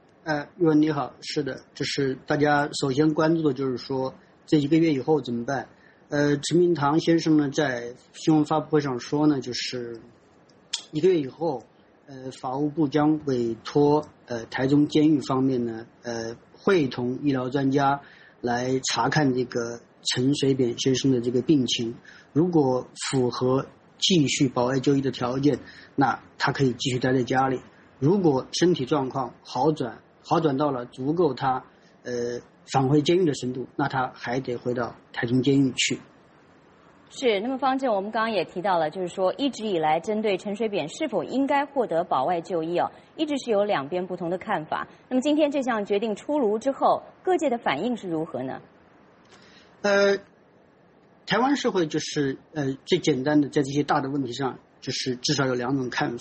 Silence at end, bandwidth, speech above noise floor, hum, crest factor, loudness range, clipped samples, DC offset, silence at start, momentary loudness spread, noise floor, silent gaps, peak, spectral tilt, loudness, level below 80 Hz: 0 s; 8.4 kHz; 33 dB; none; 16 dB; 3 LU; under 0.1%; under 0.1%; 0.25 s; 10 LU; -57 dBFS; none; -8 dBFS; -5.5 dB/octave; -25 LUFS; -62 dBFS